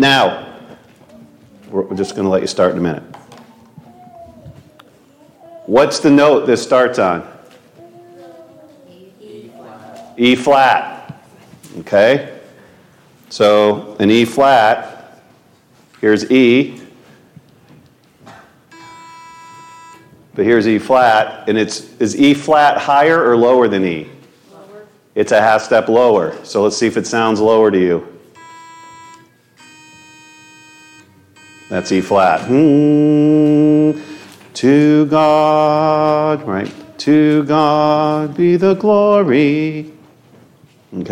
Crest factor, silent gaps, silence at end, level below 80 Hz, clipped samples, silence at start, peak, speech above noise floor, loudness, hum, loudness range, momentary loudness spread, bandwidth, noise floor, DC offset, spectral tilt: 14 dB; none; 0 s; -58 dBFS; under 0.1%; 0 s; 0 dBFS; 38 dB; -13 LUFS; none; 8 LU; 13 LU; 12.5 kHz; -50 dBFS; under 0.1%; -5.5 dB/octave